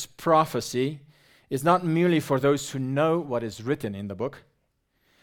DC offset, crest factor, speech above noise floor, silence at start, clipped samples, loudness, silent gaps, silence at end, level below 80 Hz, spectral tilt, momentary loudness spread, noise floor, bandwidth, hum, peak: under 0.1%; 20 dB; 48 dB; 0 s; under 0.1%; -25 LUFS; none; 0.85 s; -62 dBFS; -6 dB/octave; 11 LU; -72 dBFS; 18.5 kHz; none; -6 dBFS